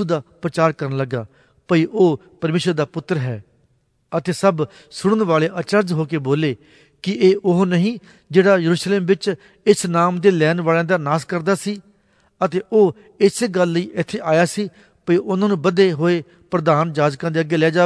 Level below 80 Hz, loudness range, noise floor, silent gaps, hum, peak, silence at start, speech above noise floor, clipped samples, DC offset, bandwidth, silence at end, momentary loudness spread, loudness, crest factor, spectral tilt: -62 dBFS; 4 LU; -62 dBFS; none; none; 0 dBFS; 0 s; 44 dB; under 0.1%; under 0.1%; 11 kHz; 0 s; 10 LU; -18 LUFS; 18 dB; -6 dB/octave